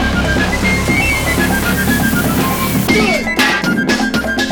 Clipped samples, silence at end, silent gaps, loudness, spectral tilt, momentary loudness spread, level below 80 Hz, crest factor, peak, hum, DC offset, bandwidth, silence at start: under 0.1%; 0 s; none; -13 LUFS; -4.5 dB/octave; 2 LU; -26 dBFS; 14 dB; 0 dBFS; none; 0.4%; over 20 kHz; 0 s